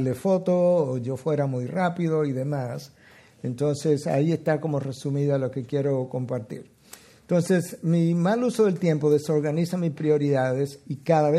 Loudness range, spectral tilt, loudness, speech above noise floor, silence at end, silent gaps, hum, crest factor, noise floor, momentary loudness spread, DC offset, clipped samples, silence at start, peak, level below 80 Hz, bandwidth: 4 LU; -7.5 dB/octave; -25 LUFS; 26 dB; 0 s; none; none; 16 dB; -50 dBFS; 9 LU; under 0.1%; under 0.1%; 0 s; -8 dBFS; -68 dBFS; 14 kHz